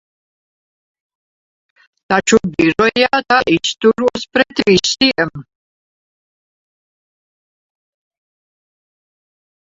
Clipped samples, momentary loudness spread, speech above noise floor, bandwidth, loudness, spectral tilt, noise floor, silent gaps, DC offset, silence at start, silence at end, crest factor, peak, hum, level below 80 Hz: under 0.1%; 5 LU; over 76 dB; 7.8 kHz; -14 LUFS; -3.5 dB/octave; under -90 dBFS; none; under 0.1%; 2.1 s; 4.3 s; 18 dB; 0 dBFS; none; -50 dBFS